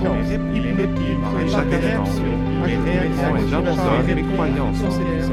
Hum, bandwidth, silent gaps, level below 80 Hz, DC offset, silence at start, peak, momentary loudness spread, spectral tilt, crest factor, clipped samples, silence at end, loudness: none; 12.5 kHz; none; -28 dBFS; under 0.1%; 0 s; -2 dBFS; 3 LU; -7.5 dB/octave; 16 dB; under 0.1%; 0 s; -20 LUFS